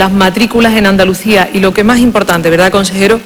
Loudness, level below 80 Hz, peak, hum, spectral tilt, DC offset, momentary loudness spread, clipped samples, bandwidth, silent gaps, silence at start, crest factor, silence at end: -8 LUFS; -32 dBFS; 0 dBFS; none; -5 dB/octave; under 0.1%; 2 LU; 0.5%; over 20 kHz; none; 0 s; 8 dB; 0 s